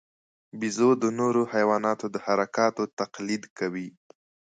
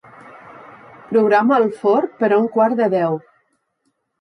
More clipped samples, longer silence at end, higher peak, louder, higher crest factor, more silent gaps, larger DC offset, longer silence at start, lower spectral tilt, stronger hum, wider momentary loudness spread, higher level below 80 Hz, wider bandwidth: neither; second, 0.7 s vs 1 s; second, -8 dBFS vs -4 dBFS; second, -26 LUFS vs -17 LUFS; about the same, 18 dB vs 14 dB; first, 2.93-2.97 s, 3.50-3.56 s vs none; neither; first, 0.55 s vs 0.35 s; second, -5 dB/octave vs -8 dB/octave; neither; first, 10 LU vs 6 LU; about the same, -74 dBFS vs -70 dBFS; second, 9.4 kHz vs 10.5 kHz